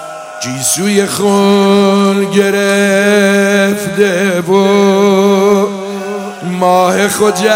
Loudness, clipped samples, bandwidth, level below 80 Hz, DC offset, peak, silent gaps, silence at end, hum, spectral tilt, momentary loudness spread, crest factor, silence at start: -10 LUFS; 0.6%; 16.5 kHz; -56 dBFS; under 0.1%; 0 dBFS; none; 0 s; none; -4.5 dB/octave; 11 LU; 10 dB; 0 s